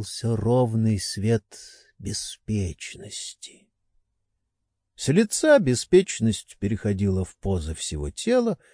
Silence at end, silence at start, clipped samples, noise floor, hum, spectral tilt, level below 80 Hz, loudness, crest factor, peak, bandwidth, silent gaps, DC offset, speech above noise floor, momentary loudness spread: 0.2 s; 0 s; under 0.1%; -79 dBFS; none; -5.5 dB/octave; -44 dBFS; -24 LUFS; 18 dB; -6 dBFS; 10.5 kHz; none; under 0.1%; 55 dB; 16 LU